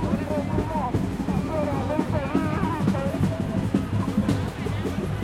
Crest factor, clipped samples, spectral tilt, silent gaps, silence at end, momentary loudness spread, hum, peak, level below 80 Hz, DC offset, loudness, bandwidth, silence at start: 16 dB; under 0.1%; -7.5 dB/octave; none; 0 s; 3 LU; none; -8 dBFS; -40 dBFS; under 0.1%; -26 LUFS; 15.5 kHz; 0 s